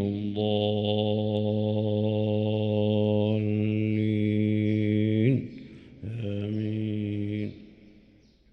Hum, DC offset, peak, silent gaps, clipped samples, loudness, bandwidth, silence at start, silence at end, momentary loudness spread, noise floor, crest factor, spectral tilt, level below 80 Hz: none; under 0.1%; -10 dBFS; none; under 0.1%; -27 LUFS; 4.6 kHz; 0 s; 0.8 s; 9 LU; -58 dBFS; 16 dB; -10 dB/octave; -62 dBFS